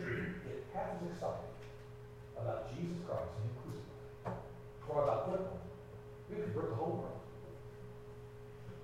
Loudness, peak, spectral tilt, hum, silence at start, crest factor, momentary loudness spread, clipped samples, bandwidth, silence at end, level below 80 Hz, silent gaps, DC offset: -43 LUFS; -22 dBFS; -8 dB/octave; none; 0 s; 20 dB; 15 LU; under 0.1%; 15.5 kHz; 0 s; -60 dBFS; none; under 0.1%